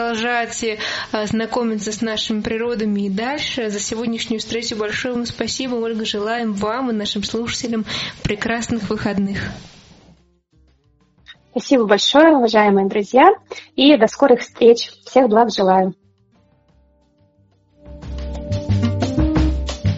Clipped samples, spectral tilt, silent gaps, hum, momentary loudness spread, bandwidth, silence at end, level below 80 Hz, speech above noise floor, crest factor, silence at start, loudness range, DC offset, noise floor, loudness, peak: under 0.1%; -4 dB/octave; none; none; 11 LU; 8 kHz; 0 s; -34 dBFS; 40 dB; 18 dB; 0 s; 10 LU; under 0.1%; -57 dBFS; -18 LUFS; 0 dBFS